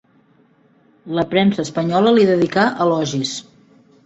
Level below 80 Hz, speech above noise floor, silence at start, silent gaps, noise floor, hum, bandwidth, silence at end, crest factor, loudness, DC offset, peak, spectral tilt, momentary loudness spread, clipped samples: -58 dBFS; 39 dB; 1.05 s; none; -55 dBFS; none; 8.2 kHz; 0.65 s; 16 dB; -17 LUFS; under 0.1%; -2 dBFS; -5.5 dB/octave; 11 LU; under 0.1%